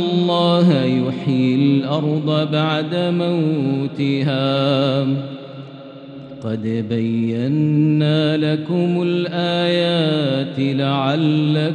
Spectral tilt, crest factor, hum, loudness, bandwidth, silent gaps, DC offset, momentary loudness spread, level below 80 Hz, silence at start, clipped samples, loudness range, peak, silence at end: -8 dB/octave; 14 dB; none; -18 LUFS; 9.2 kHz; none; under 0.1%; 9 LU; -68 dBFS; 0 s; under 0.1%; 4 LU; -4 dBFS; 0 s